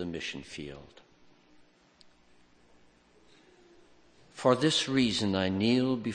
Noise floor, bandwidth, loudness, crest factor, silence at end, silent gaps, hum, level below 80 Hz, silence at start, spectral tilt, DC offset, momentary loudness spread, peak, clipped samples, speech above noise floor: -62 dBFS; 9.8 kHz; -28 LUFS; 24 dB; 0 s; none; none; -64 dBFS; 0 s; -5 dB/octave; under 0.1%; 18 LU; -10 dBFS; under 0.1%; 33 dB